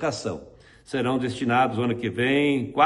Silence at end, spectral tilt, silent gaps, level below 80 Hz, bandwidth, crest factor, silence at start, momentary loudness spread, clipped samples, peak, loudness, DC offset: 0 s; -5.5 dB/octave; none; -56 dBFS; 11.5 kHz; 18 dB; 0 s; 10 LU; under 0.1%; -6 dBFS; -24 LUFS; under 0.1%